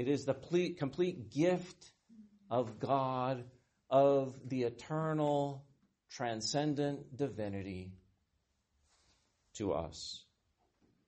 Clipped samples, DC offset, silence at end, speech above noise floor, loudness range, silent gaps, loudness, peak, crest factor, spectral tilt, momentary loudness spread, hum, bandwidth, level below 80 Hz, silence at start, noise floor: under 0.1%; under 0.1%; 0.85 s; 45 dB; 9 LU; none; -36 LUFS; -18 dBFS; 20 dB; -6 dB/octave; 13 LU; none; 8.4 kHz; -70 dBFS; 0 s; -80 dBFS